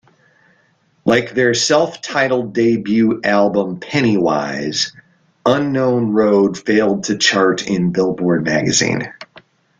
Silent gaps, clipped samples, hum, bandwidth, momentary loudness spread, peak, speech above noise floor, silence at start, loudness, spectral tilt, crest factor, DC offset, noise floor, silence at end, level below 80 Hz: none; under 0.1%; none; 9.6 kHz; 6 LU; 0 dBFS; 43 dB; 1.05 s; -16 LUFS; -4.5 dB/octave; 16 dB; under 0.1%; -58 dBFS; 0.4 s; -54 dBFS